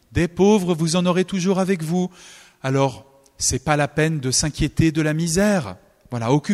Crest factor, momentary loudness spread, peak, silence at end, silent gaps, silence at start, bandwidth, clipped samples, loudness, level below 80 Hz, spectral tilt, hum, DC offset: 18 dB; 6 LU; -2 dBFS; 0 s; none; 0.1 s; 15 kHz; under 0.1%; -20 LUFS; -42 dBFS; -5 dB/octave; none; under 0.1%